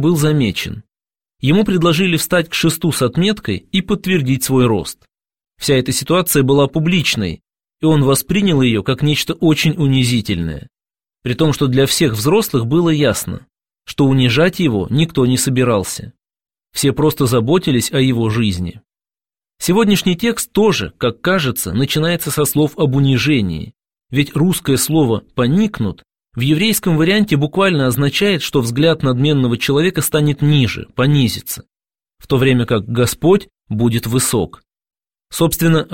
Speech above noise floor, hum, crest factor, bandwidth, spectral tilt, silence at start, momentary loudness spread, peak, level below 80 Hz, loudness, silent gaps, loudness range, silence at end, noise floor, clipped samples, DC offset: over 75 dB; none; 14 dB; 16.5 kHz; -5 dB/octave; 0 s; 9 LU; -2 dBFS; -42 dBFS; -15 LUFS; none; 2 LU; 0 s; under -90 dBFS; under 0.1%; 0.5%